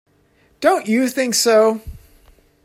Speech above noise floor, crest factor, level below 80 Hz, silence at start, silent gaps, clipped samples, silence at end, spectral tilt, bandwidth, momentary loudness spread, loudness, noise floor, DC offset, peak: 41 dB; 16 dB; -46 dBFS; 0.6 s; none; under 0.1%; 0.65 s; -3 dB/octave; 16 kHz; 6 LU; -16 LUFS; -57 dBFS; under 0.1%; -2 dBFS